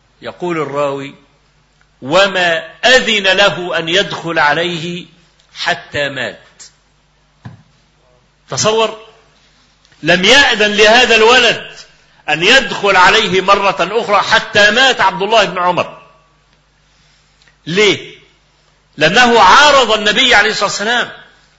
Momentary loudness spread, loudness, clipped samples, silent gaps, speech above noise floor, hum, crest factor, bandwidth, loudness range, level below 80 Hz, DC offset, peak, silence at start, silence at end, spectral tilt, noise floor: 15 LU; -10 LUFS; 0.1%; none; 42 dB; none; 14 dB; 11 kHz; 12 LU; -44 dBFS; under 0.1%; 0 dBFS; 0.25 s; 0.4 s; -2.5 dB/octave; -54 dBFS